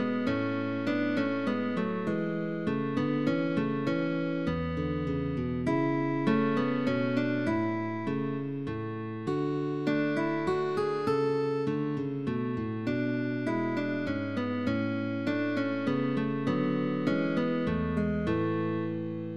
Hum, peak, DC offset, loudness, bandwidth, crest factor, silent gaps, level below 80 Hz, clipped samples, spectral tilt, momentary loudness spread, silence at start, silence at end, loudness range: none; -14 dBFS; 0.3%; -30 LUFS; 9.4 kHz; 16 dB; none; -54 dBFS; under 0.1%; -8 dB/octave; 4 LU; 0 s; 0 s; 2 LU